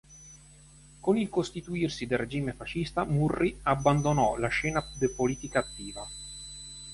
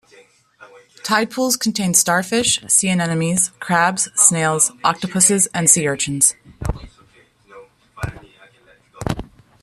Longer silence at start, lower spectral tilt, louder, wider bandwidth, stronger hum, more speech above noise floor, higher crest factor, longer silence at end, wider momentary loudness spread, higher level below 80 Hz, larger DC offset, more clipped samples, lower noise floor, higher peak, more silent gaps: second, 0.1 s vs 0.6 s; first, -5.5 dB/octave vs -2.5 dB/octave; second, -29 LUFS vs -16 LUFS; second, 11.5 kHz vs 14 kHz; neither; second, 25 dB vs 35 dB; about the same, 20 dB vs 20 dB; second, 0 s vs 0.4 s; about the same, 15 LU vs 16 LU; second, -48 dBFS vs -42 dBFS; neither; neither; about the same, -54 dBFS vs -52 dBFS; second, -10 dBFS vs 0 dBFS; neither